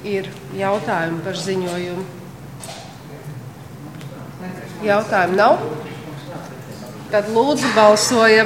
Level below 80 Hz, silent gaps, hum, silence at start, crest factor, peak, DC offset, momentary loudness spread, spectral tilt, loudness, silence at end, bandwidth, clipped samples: -56 dBFS; none; none; 0 s; 20 dB; 0 dBFS; 0.2%; 22 LU; -4 dB/octave; -18 LUFS; 0 s; 17 kHz; under 0.1%